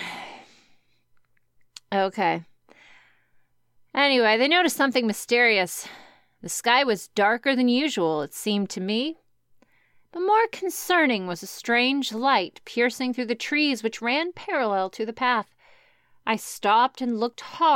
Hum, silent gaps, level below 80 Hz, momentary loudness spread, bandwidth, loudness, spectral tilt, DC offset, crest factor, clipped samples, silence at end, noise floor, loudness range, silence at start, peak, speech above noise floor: none; none; -76 dBFS; 12 LU; 16.5 kHz; -23 LUFS; -3 dB/octave; under 0.1%; 20 dB; under 0.1%; 0 s; -64 dBFS; 5 LU; 0 s; -6 dBFS; 40 dB